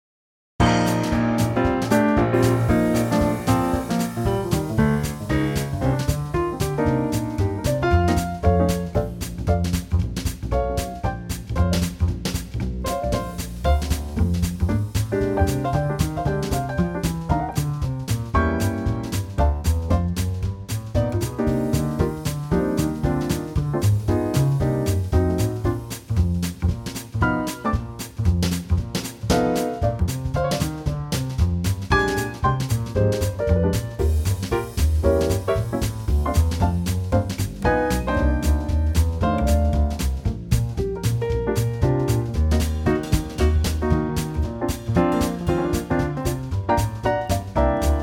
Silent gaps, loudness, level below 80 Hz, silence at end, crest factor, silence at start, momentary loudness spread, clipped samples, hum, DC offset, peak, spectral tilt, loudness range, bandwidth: none; -23 LUFS; -28 dBFS; 0 s; 16 dB; 0.6 s; 6 LU; under 0.1%; none; under 0.1%; -4 dBFS; -6.5 dB/octave; 3 LU; 17 kHz